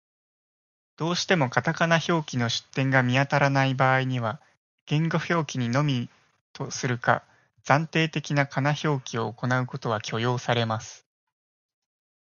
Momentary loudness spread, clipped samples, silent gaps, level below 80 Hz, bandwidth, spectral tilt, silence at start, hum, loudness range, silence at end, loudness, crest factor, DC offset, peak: 9 LU; under 0.1%; 4.57-4.87 s, 6.41-6.54 s; -64 dBFS; 7.2 kHz; -5.5 dB/octave; 1 s; none; 4 LU; 1.25 s; -25 LUFS; 24 dB; under 0.1%; -2 dBFS